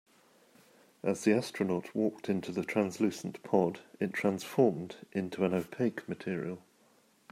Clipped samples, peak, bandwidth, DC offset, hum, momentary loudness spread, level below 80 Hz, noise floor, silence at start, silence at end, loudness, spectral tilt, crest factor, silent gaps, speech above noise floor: under 0.1%; -12 dBFS; 16 kHz; under 0.1%; none; 9 LU; -76 dBFS; -66 dBFS; 1.05 s; 0.75 s; -33 LUFS; -6.5 dB/octave; 22 dB; none; 34 dB